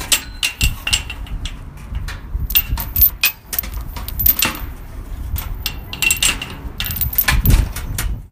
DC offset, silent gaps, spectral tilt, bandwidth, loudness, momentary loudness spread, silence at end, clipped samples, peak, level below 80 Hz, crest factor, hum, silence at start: under 0.1%; none; -2 dB/octave; 16.5 kHz; -17 LUFS; 16 LU; 0.05 s; under 0.1%; 0 dBFS; -24 dBFS; 20 dB; none; 0 s